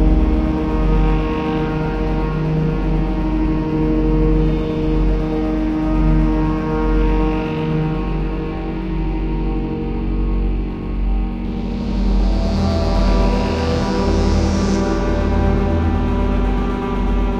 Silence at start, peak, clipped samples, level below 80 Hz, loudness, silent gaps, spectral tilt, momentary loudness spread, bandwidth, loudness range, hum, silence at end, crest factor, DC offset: 0 s; -4 dBFS; under 0.1%; -20 dBFS; -19 LUFS; none; -8 dB/octave; 6 LU; 7.4 kHz; 4 LU; none; 0 s; 12 dB; under 0.1%